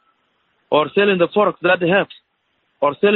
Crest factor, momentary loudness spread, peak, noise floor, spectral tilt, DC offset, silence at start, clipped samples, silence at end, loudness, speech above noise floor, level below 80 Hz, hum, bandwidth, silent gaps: 16 dB; 6 LU; -2 dBFS; -67 dBFS; -3 dB/octave; under 0.1%; 0.7 s; under 0.1%; 0 s; -17 LUFS; 51 dB; -64 dBFS; none; 4.3 kHz; none